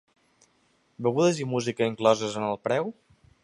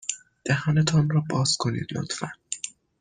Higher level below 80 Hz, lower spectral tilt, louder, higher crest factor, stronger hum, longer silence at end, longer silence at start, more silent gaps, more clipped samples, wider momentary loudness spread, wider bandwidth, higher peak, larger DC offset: second, -68 dBFS vs -58 dBFS; about the same, -5.5 dB/octave vs -4.5 dB/octave; about the same, -26 LUFS vs -25 LUFS; first, 22 dB vs 16 dB; neither; first, 0.5 s vs 0.3 s; first, 1 s vs 0.05 s; neither; neither; second, 6 LU vs 12 LU; first, 11.5 kHz vs 9.8 kHz; about the same, -6 dBFS vs -8 dBFS; neither